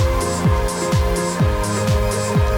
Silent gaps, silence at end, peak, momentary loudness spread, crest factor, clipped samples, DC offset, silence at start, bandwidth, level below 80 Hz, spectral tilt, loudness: none; 0 s; -8 dBFS; 1 LU; 10 dB; under 0.1%; under 0.1%; 0 s; 19 kHz; -24 dBFS; -5.5 dB/octave; -19 LUFS